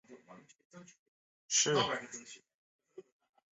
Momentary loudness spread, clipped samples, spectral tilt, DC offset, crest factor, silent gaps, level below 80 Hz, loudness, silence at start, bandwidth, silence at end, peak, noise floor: 26 LU; under 0.1%; -1.5 dB/octave; under 0.1%; 22 dB; 0.65-0.70 s, 0.99-1.49 s, 2.55-2.79 s; -80 dBFS; -31 LUFS; 0.1 s; 8.2 kHz; 0.5 s; -18 dBFS; -59 dBFS